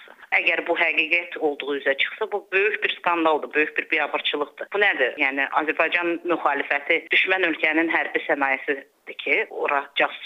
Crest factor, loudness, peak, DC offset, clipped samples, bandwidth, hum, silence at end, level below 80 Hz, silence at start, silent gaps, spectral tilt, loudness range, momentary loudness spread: 18 dB; -22 LUFS; -6 dBFS; under 0.1%; under 0.1%; 14.5 kHz; none; 0 s; -76 dBFS; 0 s; none; -4.5 dB/octave; 1 LU; 6 LU